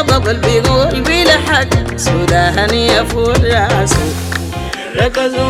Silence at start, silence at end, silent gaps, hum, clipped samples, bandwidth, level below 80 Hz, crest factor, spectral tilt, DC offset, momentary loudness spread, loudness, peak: 0 s; 0 s; none; none; under 0.1%; 16 kHz; -24 dBFS; 12 dB; -4.5 dB/octave; under 0.1%; 9 LU; -12 LUFS; 0 dBFS